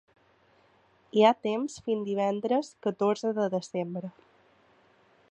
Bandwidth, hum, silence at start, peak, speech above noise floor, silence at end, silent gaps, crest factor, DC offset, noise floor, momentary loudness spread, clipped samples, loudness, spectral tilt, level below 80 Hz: 9.8 kHz; none; 1.15 s; -6 dBFS; 36 dB; 1.2 s; none; 24 dB; under 0.1%; -64 dBFS; 11 LU; under 0.1%; -28 LUFS; -6 dB/octave; -76 dBFS